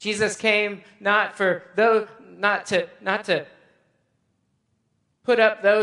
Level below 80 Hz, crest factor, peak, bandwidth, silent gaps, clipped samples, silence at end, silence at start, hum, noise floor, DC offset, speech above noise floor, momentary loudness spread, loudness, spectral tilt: -70 dBFS; 20 dB; -2 dBFS; 11.5 kHz; none; under 0.1%; 0 s; 0 s; none; -71 dBFS; under 0.1%; 49 dB; 8 LU; -22 LUFS; -3.5 dB/octave